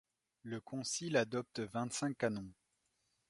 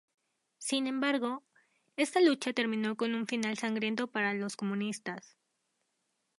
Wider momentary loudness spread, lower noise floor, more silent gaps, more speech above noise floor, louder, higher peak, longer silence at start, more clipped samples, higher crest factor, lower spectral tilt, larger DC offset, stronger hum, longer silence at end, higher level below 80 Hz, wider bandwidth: about the same, 12 LU vs 13 LU; about the same, -82 dBFS vs -81 dBFS; neither; second, 43 dB vs 49 dB; second, -39 LUFS vs -32 LUFS; second, -18 dBFS vs -14 dBFS; second, 0.45 s vs 0.6 s; neither; about the same, 22 dB vs 20 dB; about the same, -4 dB/octave vs -4 dB/octave; neither; neither; second, 0.8 s vs 1.2 s; first, -74 dBFS vs -84 dBFS; about the same, 11.5 kHz vs 11.5 kHz